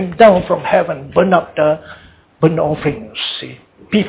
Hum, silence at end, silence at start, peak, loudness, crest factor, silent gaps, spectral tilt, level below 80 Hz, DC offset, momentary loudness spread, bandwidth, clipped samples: none; 0 s; 0 s; 0 dBFS; -15 LUFS; 14 dB; none; -10 dB/octave; -44 dBFS; under 0.1%; 12 LU; 4 kHz; under 0.1%